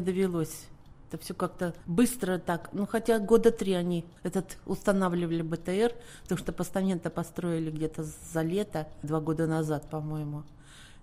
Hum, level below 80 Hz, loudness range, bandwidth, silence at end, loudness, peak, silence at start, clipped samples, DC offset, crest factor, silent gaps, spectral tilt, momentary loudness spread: none; -52 dBFS; 4 LU; 16 kHz; 0 s; -30 LUFS; -10 dBFS; 0 s; under 0.1%; under 0.1%; 20 dB; none; -6.5 dB/octave; 10 LU